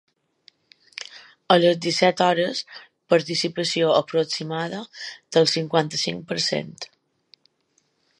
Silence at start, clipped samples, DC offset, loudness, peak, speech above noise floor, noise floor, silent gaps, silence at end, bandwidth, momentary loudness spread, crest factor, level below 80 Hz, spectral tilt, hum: 1 s; under 0.1%; under 0.1%; -22 LUFS; -2 dBFS; 46 dB; -68 dBFS; none; 1.35 s; 11.5 kHz; 19 LU; 22 dB; -72 dBFS; -4 dB/octave; none